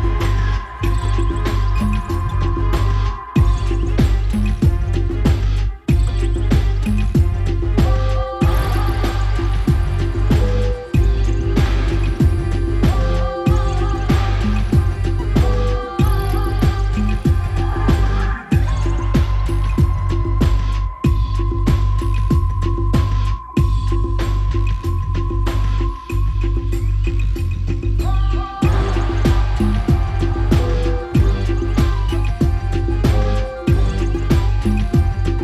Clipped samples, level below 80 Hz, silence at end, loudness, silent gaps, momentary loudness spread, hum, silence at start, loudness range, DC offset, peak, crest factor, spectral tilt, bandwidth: under 0.1%; -18 dBFS; 0 s; -19 LUFS; none; 4 LU; none; 0 s; 2 LU; under 0.1%; -2 dBFS; 14 dB; -7.5 dB/octave; 12.5 kHz